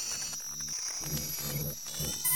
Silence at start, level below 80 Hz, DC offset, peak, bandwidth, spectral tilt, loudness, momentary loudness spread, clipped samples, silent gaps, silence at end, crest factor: 0 s; -56 dBFS; 0.2%; -16 dBFS; 19.5 kHz; -2 dB/octave; -34 LUFS; 2 LU; under 0.1%; none; 0 s; 20 dB